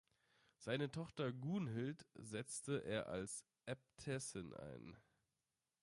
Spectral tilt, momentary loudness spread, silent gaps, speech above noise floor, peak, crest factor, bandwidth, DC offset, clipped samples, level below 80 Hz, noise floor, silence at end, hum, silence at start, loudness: -5 dB/octave; 11 LU; none; over 43 dB; -28 dBFS; 20 dB; 11.5 kHz; under 0.1%; under 0.1%; -76 dBFS; under -90 dBFS; 0.85 s; none; 0.6 s; -47 LUFS